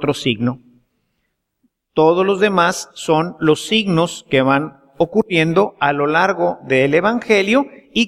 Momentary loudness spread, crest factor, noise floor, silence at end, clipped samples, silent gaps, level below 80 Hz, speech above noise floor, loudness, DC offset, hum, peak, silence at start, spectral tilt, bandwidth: 7 LU; 16 dB; -71 dBFS; 0 s; under 0.1%; none; -54 dBFS; 55 dB; -16 LUFS; under 0.1%; none; 0 dBFS; 0 s; -5 dB/octave; 14 kHz